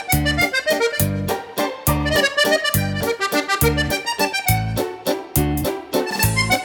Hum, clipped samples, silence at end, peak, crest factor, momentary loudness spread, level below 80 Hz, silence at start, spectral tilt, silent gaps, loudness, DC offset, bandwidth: none; under 0.1%; 0 s; -2 dBFS; 18 dB; 7 LU; -34 dBFS; 0 s; -4 dB/octave; none; -19 LUFS; under 0.1%; over 20 kHz